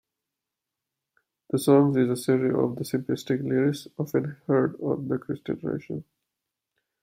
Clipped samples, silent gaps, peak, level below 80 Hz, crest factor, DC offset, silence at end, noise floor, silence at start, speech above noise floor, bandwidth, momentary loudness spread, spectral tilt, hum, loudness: under 0.1%; none; -6 dBFS; -66 dBFS; 20 dB; under 0.1%; 1 s; -87 dBFS; 1.55 s; 62 dB; 16 kHz; 12 LU; -7 dB/octave; none; -26 LUFS